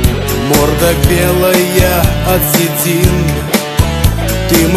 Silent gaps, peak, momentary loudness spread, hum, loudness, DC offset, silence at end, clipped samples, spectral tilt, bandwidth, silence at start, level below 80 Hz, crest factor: none; 0 dBFS; 4 LU; none; -11 LUFS; under 0.1%; 0 s; under 0.1%; -5 dB/octave; 15 kHz; 0 s; -18 dBFS; 10 dB